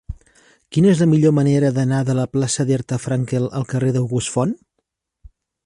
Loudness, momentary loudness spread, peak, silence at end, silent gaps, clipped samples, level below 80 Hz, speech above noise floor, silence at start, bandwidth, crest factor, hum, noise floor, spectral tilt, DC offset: -18 LUFS; 9 LU; -4 dBFS; 1.1 s; none; under 0.1%; -46 dBFS; 57 dB; 0.1 s; 11.5 kHz; 14 dB; none; -75 dBFS; -6.5 dB/octave; under 0.1%